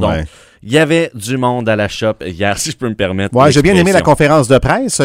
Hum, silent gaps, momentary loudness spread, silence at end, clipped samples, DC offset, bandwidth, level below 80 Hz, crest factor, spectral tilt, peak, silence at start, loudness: none; none; 9 LU; 0 s; 0.2%; under 0.1%; 16.5 kHz; -32 dBFS; 12 dB; -5 dB/octave; 0 dBFS; 0 s; -12 LUFS